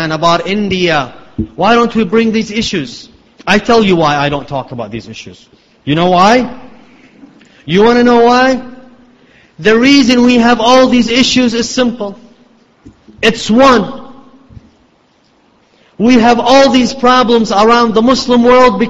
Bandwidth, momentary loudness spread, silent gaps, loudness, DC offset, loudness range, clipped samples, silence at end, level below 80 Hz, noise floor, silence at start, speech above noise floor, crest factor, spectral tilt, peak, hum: 8 kHz; 16 LU; none; -9 LUFS; under 0.1%; 5 LU; 0.2%; 0 s; -40 dBFS; -51 dBFS; 0 s; 42 dB; 10 dB; -4.5 dB/octave; 0 dBFS; none